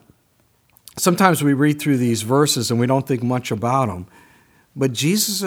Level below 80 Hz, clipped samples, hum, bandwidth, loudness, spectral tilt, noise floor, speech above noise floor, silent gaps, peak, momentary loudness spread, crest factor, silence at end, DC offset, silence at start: -60 dBFS; under 0.1%; none; over 20 kHz; -18 LUFS; -4.5 dB/octave; -61 dBFS; 43 dB; none; 0 dBFS; 8 LU; 20 dB; 0 s; under 0.1%; 0.95 s